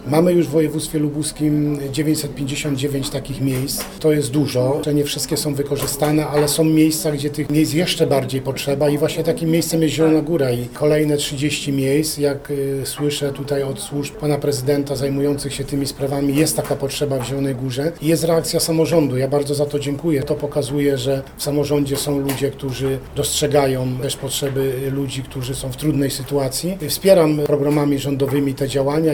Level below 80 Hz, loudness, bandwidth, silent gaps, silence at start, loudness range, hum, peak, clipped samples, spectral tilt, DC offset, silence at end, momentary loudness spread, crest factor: -42 dBFS; -19 LUFS; over 20 kHz; none; 0 s; 3 LU; none; 0 dBFS; under 0.1%; -5.5 dB/octave; under 0.1%; 0 s; 7 LU; 18 dB